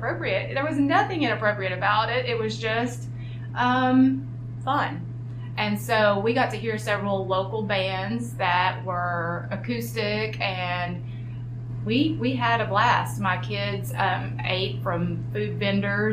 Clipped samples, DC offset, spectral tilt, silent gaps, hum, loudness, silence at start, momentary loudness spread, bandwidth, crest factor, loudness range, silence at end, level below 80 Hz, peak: under 0.1%; under 0.1%; -6 dB/octave; none; none; -25 LUFS; 0 s; 11 LU; 15.5 kHz; 18 dB; 3 LU; 0 s; -50 dBFS; -6 dBFS